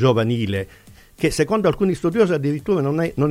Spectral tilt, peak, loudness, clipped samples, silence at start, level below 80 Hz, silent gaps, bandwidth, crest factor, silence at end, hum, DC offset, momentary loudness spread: -6.5 dB/octave; -4 dBFS; -20 LUFS; under 0.1%; 0 s; -44 dBFS; none; 16 kHz; 16 dB; 0 s; none; under 0.1%; 6 LU